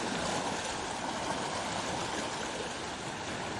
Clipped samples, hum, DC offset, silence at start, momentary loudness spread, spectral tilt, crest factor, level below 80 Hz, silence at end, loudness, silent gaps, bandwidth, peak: under 0.1%; none; under 0.1%; 0 s; 4 LU; -3 dB/octave; 16 dB; -58 dBFS; 0 s; -35 LUFS; none; 11.5 kHz; -20 dBFS